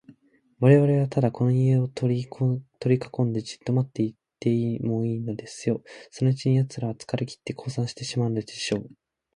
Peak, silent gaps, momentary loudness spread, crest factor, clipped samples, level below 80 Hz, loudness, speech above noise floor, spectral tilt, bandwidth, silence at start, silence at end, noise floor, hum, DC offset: -4 dBFS; none; 10 LU; 22 dB; under 0.1%; -62 dBFS; -25 LUFS; 35 dB; -7.5 dB/octave; 11 kHz; 0.1 s; 0.5 s; -59 dBFS; none; under 0.1%